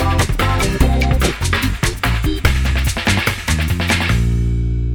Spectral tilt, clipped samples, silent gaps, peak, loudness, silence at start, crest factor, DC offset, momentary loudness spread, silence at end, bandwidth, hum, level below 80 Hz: -4.5 dB/octave; under 0.1%; none; 0 dBFS; -17 LUFS; 0 s; 16 dB; under 0.1%; 3 LU; 0 s; 20 kHz; none; -20 dBFS